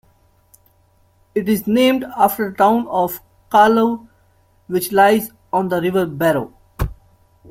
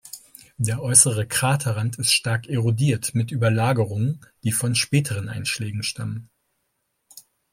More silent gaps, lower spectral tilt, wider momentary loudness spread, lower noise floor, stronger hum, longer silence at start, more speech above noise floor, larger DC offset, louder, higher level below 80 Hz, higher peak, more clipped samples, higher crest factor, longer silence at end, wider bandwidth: neither; first, -5.5 dB/octave vs -3.5 dB/octave; about the same, 14 LU vs 12 LU; second, -56 dBFS vs -74 dBFS; neither; first, 1.35 s vs 0.05 s; second, 41 dB vs 52 dB; neither; first, -17 LUFS vs -21 LUFS; first, -40 dBFS vs -58 dBFS; about the same, -2 dBFS vs 0 dBFS; neither; second, 16 dB vs 24 dB; first, 0.55 s vs 0.35 s; about the same, 16.5 kHz vs 16.5 kHz